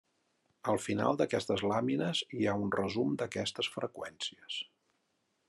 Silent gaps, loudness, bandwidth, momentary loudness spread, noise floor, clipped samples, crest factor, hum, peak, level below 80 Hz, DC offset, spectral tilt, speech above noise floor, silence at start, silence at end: none; -34 LUFS; 12.5 kHz; 9 LU; -79 dBFS; under 0.1%; 20 dB; none; -16 dBFS; -80 dBFS; under 0.1%; -5 dB/octave; 45 dB; 0.65 s; 0.85 s